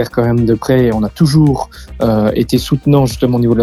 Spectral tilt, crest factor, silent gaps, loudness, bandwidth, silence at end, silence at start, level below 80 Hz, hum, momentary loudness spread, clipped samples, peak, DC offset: -7.5 dB/octave; 12 dB; none; -13 LUFS; 15 kHz; 0 s; 0 s; -32 dBFS; none; 4 LU; under 0.1%; 0 dBFS; under 0.1%